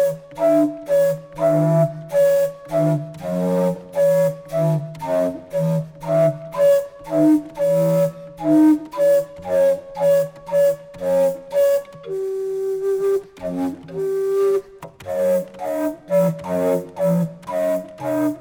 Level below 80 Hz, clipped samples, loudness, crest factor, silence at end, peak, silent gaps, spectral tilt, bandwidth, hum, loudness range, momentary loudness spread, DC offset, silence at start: -58 dBFS; under 0.1%; -20 LUFS; 14 dB; 0 s; -6 dBFS; none; -8 dB/octave; over 20 kHz; none; 4 LU; 8 LU; under 0.1%; 0 s